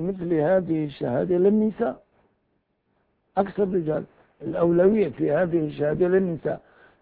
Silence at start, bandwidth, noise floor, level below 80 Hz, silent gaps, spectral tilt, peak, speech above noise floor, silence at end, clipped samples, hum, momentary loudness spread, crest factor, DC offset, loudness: 0 s; 4.6 kHz; -72 dBFS; -56 dBFS; none; -12.5 dB/octave; -8 dBFS; 49 dB; 0.45 s; under 0.1%; none; 11 LU; 16 dB; under 0.1%; -23 LUFS